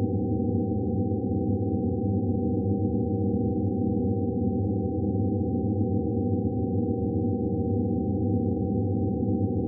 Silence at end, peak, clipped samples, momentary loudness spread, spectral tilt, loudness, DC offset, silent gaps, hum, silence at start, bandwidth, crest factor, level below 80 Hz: 0 s; -14 dBFS; under 0.1%; 1 LU; -18 dB/octave; -27 LUFS; under 0.1%; none; none; 0 s; 0.9 kHz; 12 dB; -46 dBFS